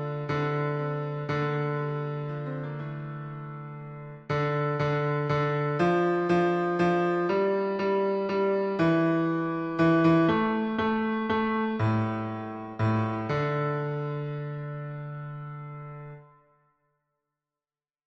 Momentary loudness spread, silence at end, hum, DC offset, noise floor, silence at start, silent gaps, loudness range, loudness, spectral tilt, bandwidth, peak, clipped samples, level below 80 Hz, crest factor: 14 LU; 1.85 s; none; under 0.1%; under -90 dBFS; 0 s; none; 9 LU; -27 LUFS; -8.5 dB/octave; 7.6 kHz; -12 dBFS; under 0.1%; -60 dBFS; 16 dB